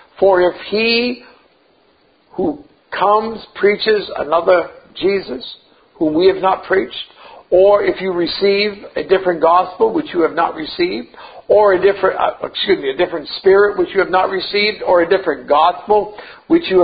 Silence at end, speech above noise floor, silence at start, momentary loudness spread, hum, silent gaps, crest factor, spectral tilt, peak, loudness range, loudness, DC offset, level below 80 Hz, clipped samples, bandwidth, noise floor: 0 s; 40 dB; 0.2 s; 14 LU; none; none; 16 dB; -9.5 dB/octave; 0 dBFS; 3 LU; -15 LUFS; under 0.1%; -50 dBFS; under 0.1%; 5 kHz; -55 dBFS